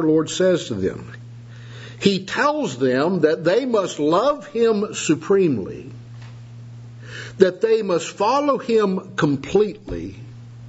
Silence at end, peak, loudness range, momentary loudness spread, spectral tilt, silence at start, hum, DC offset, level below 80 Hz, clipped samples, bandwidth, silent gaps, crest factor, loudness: 0 s; 0 dBFS; 3 LU; 21 LU; -5.5 dB/octave; 0 s; none; under 0.1%; -52 dBFS; under 0.1%; 8 kHz; none; 20 dB; -20 LUFS